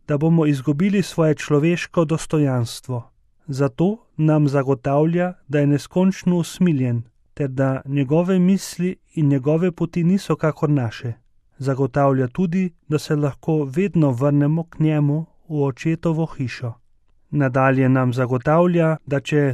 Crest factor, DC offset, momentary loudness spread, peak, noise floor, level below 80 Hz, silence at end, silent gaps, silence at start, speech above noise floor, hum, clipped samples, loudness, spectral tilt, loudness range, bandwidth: 14 dB; under 0.1%; 9 LU; -4 dBFS; -56 dBFS; -52 dBFS; 0 s; none; 0.1 s; 37 dB; none; under 0.1%; -20 LUFS; -7.5 dB/octave; 2 LU; 13 kHz